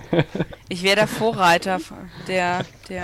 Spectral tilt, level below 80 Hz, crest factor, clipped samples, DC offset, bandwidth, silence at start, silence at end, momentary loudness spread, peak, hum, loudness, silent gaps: -4.5 dB/octave; -50 dBFS; 18 dB; under 0.1%; under 0.1%; 16.5 kHz; 0 s; 0 s; 13 LU; -4 dBFS; none; -21 LUFS; none